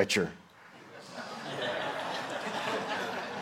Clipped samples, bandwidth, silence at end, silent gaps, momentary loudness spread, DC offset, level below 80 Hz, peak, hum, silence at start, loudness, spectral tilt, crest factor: under 0.1%; 16.5 kHz; 0 s; none; 19 LU; under 0.1%; -72 dBFS; -12 dBFS; none; 0 s; -34 LUFS; -3.5 dB/octave; 22 dB